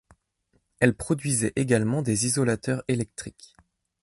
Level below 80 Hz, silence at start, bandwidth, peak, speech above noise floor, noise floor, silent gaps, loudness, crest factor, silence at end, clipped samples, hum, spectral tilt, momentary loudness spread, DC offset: -54 dBFS; 0.8 s; 12 kHz; -4 dBFS; 46 dB; -71 dBFS; none; -25 LUFS; 24 dB; 0.75 s; under 0.1%; none; -5 dB/octave; 7 LU; under 0.1%